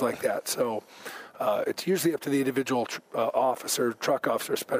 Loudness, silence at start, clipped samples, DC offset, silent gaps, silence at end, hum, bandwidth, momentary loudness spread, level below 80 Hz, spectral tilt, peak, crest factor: -28 LUFS; 0 s; under 0.1%; under 0.1%; none; 0 s; none; 16 kHz; 6 LU; -76 dBFS; -4 dB/octave; -12 dBFS; 16 dB